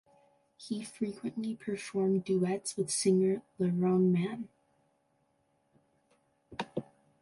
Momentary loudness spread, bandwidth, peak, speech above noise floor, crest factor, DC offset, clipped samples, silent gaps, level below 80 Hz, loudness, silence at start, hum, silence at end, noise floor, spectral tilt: 15 LU; 11.5 kHz; -16 dBFS; 43 dB; 18 dB; under 0.1%; under 0.1%; none; -74 dBFS; -32 LUFS; 0.6 s; none; 0.4 s; -74 dBFS; -6 dB/octave